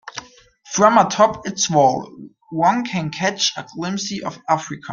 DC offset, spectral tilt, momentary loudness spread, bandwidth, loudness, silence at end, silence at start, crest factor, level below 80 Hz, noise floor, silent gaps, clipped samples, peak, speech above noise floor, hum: under 0.1%; -3.5 dB/octave; 14 LU; 9.4 kHz; -19 LUFS; 0 s; 0.05 s; 18 dB; -58 dBFS; -47 dBFS; none; under 0.1%; -2 dBFS; 29 dB; none